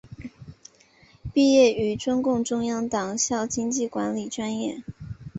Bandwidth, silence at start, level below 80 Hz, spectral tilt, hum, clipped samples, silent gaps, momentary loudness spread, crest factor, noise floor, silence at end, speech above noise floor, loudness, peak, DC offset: 8.2 kHz; 0.05 s; -54 dBFS; -4 dB/octave; none; under 0.1%; none; 21 LU; 18 dB; -56 dBFS; 0 s; 33 dB; -24 LUFS; -6 dBFS; under 0.1%